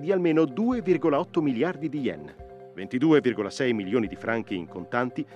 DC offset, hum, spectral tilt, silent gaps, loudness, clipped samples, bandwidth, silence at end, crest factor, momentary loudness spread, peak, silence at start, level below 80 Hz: under 0.1%; none; -7 dB/octave; none; -26 LUFS; under 0.1%; 9.8 kHz; 0 s; 16 dB; 12 LU; -10 dBFS; 0 s; -60 dBFS